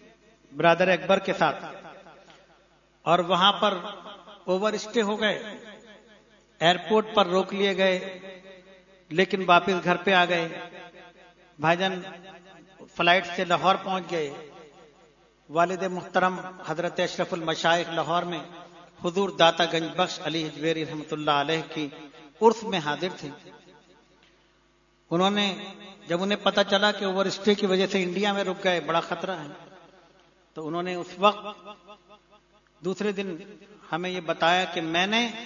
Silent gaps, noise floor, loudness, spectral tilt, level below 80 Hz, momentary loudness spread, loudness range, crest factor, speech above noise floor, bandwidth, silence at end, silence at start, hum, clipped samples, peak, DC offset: none; -63 dBFS; -25 LUFS; -4.5 dB/octave; -68 dBFS; 19 LU; 5 LU; 24 dB; 38 dB; 7.4 kHz; 0 s; 0.5 s; none; under 0.1%; -4 dBFS; under 0.1%